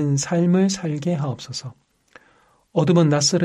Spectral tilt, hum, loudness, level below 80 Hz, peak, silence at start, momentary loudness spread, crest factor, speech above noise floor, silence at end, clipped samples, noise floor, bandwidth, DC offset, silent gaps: -5.5 dB/octave; none; -20 LUFS; -60 dBFS; -4 dBFS; 0 s; 14 LU; 16 dB; 39 dB; 0 s; under 0.1%; -58 dBFS; 11.5 kHz; under 0.1%; none